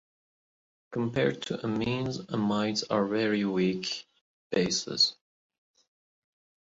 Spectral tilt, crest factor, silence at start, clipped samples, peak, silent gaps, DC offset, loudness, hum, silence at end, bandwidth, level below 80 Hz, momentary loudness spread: -4.5 dB/octave; 20 dB; 0.9 s; under 0.1%; -12 dBFS; 4.21-4.50 s; under 0.1%; -29 LUFS; none; 1.55 s; 8 kHz; -64 dBFS; 8 LU